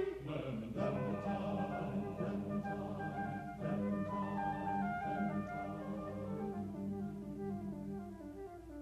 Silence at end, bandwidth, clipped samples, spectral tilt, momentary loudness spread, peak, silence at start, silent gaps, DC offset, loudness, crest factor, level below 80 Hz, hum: 0 s; 13 kHz; under 0.1%; -8.5 dB/octave; 6 LU; -26 dBFS; 0 s; none; under 0.1%; -41 LUFS; 14 dB; -62 dBFS; none